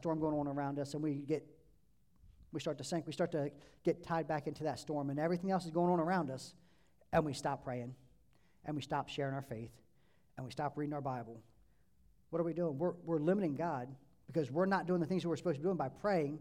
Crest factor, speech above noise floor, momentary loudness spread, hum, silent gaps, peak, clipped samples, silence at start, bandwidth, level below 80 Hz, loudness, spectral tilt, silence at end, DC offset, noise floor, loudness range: 20 dB; 36 dB; 13 LU; none; none; -18 dBFS; under 0.1%; 0 s; 14 kHz; -68 dBFS; -38 LUFS; -7 dB/octave; 0 s; under 0.1%; -73 dBFS; 7 LU